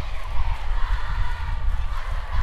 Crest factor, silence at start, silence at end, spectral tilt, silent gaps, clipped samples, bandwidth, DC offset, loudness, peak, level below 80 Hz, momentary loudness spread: 12 dB; 0 s; 0 s; -5.5 dB/octave; none; under 0.1%; 6.2 kHz; under 0.1%; -30 LUFS; -8 dBFS; -24 dBFS; 2 LU